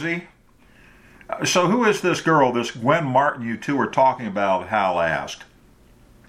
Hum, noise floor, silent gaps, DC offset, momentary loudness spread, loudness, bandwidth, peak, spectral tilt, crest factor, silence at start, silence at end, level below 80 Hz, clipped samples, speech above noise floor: none; -53 dBFS; none; under 0.1%; 10 LU; -20 LUFS; 16 kHz; -2 dBFS; -4.5 dB/octave; 20 dB; 0 s; 0.85 s; -56 dBFS; under 0.1%; 32 dB